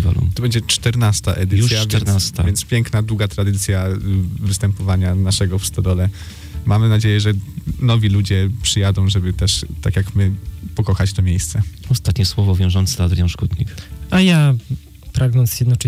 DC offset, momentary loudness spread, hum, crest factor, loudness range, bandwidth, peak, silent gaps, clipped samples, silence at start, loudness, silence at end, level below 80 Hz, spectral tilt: under 0.1%; 7 LU; none; 12 dB; 2 LU; 15.5 kHz; -4 dBFS; none; under 0.1%; 0 s; -17 LUFS; 0 s; -30 dBFS; -5 dB/octave